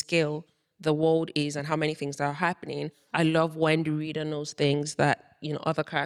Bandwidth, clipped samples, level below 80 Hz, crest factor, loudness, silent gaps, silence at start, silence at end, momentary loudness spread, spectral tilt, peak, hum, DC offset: 12 kHz; under 0.1%; -66 dBFS; 18 dB; -28 LUFS; none; 0 s; 0 s; 8 LU; -5.5 dB/octave; -10 dBFS; none; under 0.1%